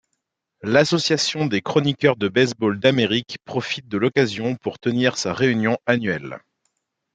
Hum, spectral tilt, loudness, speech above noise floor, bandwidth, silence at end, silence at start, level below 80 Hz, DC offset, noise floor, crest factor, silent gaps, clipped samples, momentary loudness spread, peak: none; -5 dB/octave; -20 LUFS; 57 dB; 9.4 kHz; 0.75 s; 0.65 s; -62 dBFS; under 0.1%; -77 dBFS; 20 dB; none; under 0.1%; 8 LU; -2 dBFS